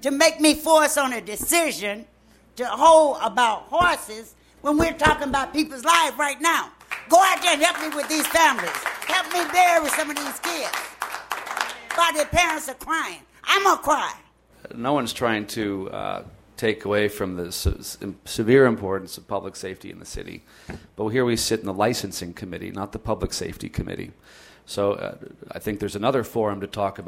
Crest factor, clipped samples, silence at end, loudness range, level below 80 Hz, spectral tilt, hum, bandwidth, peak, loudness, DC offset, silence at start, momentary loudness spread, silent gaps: 22 dB; under 0.1%; 0 s; 8 LU; -44 dBFS; -3 dB/octave; none; 16 kHz; 0 dBFS; -22 LUFS; under 0.1%; 0 s; 17 LU; none